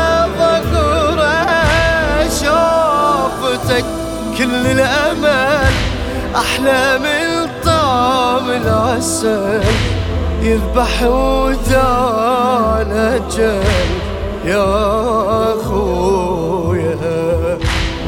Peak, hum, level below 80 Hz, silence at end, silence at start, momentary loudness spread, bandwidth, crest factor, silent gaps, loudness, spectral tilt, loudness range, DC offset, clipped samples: 0 dBFS; none; -24 dBFS; 0 s; 0 s; 5 LU; 17.5 kHz; 14 dB; none; -14 LUFS; -5 dB/octave; 2 LU; under 0.1%; under 0.1%